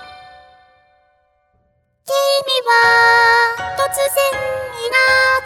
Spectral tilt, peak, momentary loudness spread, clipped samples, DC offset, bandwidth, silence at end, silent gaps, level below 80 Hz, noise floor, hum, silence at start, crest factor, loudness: 0 dB/octave; 0 dBFS; 11 LU; under 0.1%; under 0.1%; 19 kHz; 0 s; none; -52 dBFS; -62 dBFS; none; 0 s; 16 dB; -14 LUFS